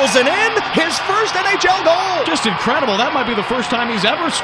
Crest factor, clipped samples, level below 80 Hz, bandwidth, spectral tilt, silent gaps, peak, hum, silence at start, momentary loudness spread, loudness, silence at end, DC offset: 16 dB; under 0.1%; -50 dBFS; 11 kHz; -3 dB/octave; none; 0 dBFS; none; 0 s; 4 LU; -15 LUFS; 0 s; under 0.1%